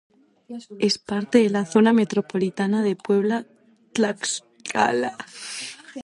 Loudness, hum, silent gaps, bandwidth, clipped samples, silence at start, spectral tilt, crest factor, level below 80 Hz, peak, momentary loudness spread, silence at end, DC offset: -23 LUFS; none; none; 11.5 kHz; under 0.1%; 0.5 s; -4.5 dB/octave; 20 dB; -68 dBFS; -2 dBFS; 14 LU; 0 s; under 0.1%